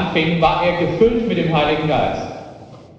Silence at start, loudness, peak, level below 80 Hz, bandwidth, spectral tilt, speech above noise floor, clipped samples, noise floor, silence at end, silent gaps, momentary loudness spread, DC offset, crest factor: 0 s; -17 LUFS; -2 dBFS; -38 dBFS; 7.6 kHz; -7 dB/octave; 22 dB; under 0.1%; -39 dBFS; 0.1 s; none; 14 LU; under 0.1%; 16 dB